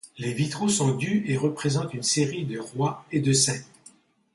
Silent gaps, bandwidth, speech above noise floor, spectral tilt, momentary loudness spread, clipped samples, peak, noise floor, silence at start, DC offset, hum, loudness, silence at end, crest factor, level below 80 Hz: none; 11.5 kHz; 30 dB; -4.5 dB/octave; 9 LU; under 0.1%; -8 dBFS; -55 dBFS; 0.05 s; under 0.1%; none; -25 LUFS; 0.7 s; 18 dB; -64 dBFS